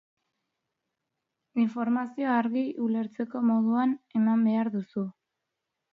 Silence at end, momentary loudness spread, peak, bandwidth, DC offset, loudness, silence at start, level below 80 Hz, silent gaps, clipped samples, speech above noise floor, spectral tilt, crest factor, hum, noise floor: 0.85 s; 9 LU; -12 dBFS; 4.8 kHz; under 0.1%; -28 LUFS; 1.55 s; -80 dBFS; none; under 0.1%; 58 dB; -9 dB/octave; 16 dB; none; -84 dBFS